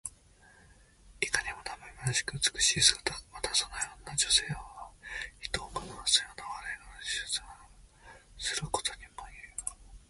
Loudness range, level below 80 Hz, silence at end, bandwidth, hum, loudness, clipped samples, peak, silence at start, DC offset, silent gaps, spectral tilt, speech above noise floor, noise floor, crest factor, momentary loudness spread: 9 LU; -54 dBFS; 0.1 s; 12 kHz; none; -31 LUFS; under 0.1%; -6 dBFS; 0.05 s; under 0.1%; none; -0.5 dB/octave; 29 dB; -60 dBFS; 30 dB; 16 LU